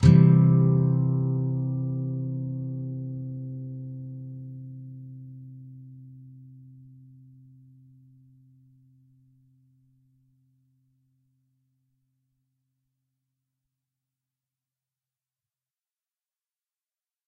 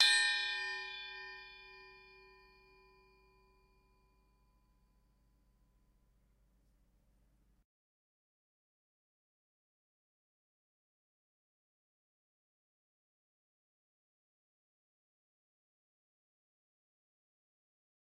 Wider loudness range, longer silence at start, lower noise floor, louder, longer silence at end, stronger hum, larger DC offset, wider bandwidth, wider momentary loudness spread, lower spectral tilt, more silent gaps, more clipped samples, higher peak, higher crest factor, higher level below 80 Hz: about the same, 26 LU vs 25 LU; about the same, 0 s vs 0 s; first, under -90 dBFS vs -72 dBFS; first, -25 LUFS vs -34 LUFS; second, 10.85 s vs 16.15 s; neither; neither; second, 7.2 kHz vs 9.4 kHz; about the same, 27 LU vs 26 LU; first, -10 dB/octave vs 2.5 dB/octave; neither; neither; first, -4 dBFS vs -14 dBFS; second, 24 dB vs 32 dB; first, -54 dBFS vs -76 dBFS